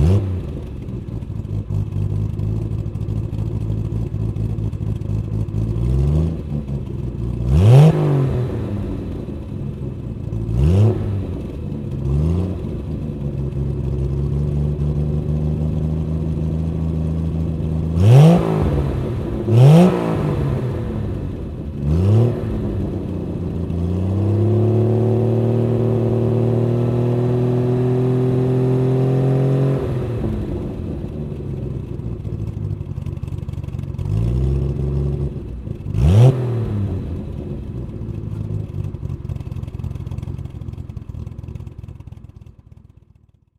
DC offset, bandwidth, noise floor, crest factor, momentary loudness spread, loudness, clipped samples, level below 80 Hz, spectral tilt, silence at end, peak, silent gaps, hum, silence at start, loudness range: under 0.1%; 11 kHz; -53 dBFS; 18 dB; 13 LU; -20 LUFS; under 0.1%; -30 dBFS; -9.5 dB/octave; 1.35 s; 0 dBFS; none; none; 0 s; 11 LU